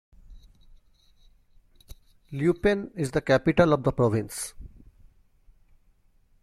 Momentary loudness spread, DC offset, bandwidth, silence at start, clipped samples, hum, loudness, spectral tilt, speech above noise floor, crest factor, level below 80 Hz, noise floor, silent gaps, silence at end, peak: 13 LU; under 0.1%; 15.5 kHz; 0.3 s; under 0.1%; none; -25 LUFS; -6 dB/octave; 38 dB; 24 dB; -48 dBFS; -62 dBFS; none; 1.75 s; -4 dBFS